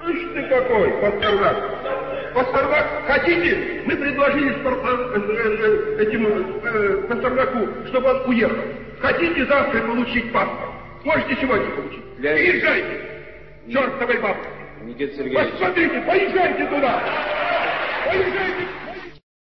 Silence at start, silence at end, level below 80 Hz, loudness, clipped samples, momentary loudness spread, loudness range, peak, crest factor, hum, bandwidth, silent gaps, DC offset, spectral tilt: 0 s; 0.25 s; -46 dBFS; -20 LUFS; under 0.1%; 11 LU; 2 LU; -6 dBFS; 16 dB; none; 6 kHz; none; 0.5%; -7.5 dB/octave